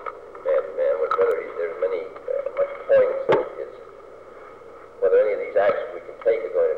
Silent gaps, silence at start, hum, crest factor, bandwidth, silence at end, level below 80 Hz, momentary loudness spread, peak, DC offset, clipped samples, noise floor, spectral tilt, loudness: none; 0 s; none; 16 dB; 5.4 kHz; 0 s; -62 dBFS; 23 LU; -8 dBFS; 0.2%; under 0.1%; -43 dBFS; -6.5 dB/octave; -23 LUFS